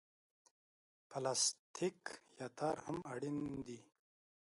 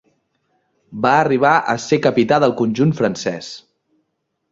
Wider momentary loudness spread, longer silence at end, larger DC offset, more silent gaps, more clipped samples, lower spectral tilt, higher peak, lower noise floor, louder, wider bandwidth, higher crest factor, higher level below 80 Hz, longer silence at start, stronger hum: about the same, 16 LU vs 16 LU; second, 0.65 s vs 0.9 s; neither; first, 1.59-1.74 s vs none; neither; second, -3 dB/octave vs -6 dB/octave; second, -24 dBFS vs -2 dBFS; first, under -90 dBFS vs -72 dBFS; second, -41 LUFS vs -16 LUFS; first, 11.5 kHz vs 7.8 kHz; about the same, 20 dB vs 16 dB; second, -76 dBFS vs -58 dBFS; first, 1.1 s vs 0.9 s; neither